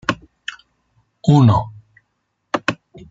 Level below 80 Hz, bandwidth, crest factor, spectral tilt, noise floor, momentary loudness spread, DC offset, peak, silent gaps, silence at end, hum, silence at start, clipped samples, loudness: -48 dBFS; 7.8 kHz; 18 dB; -7 dB/octave; -71 dBFS; 20 LU; under 0.1%; -2 dBFS; none; 0.35 s; none; 0.1 s; under 0.1%; -17 LUFS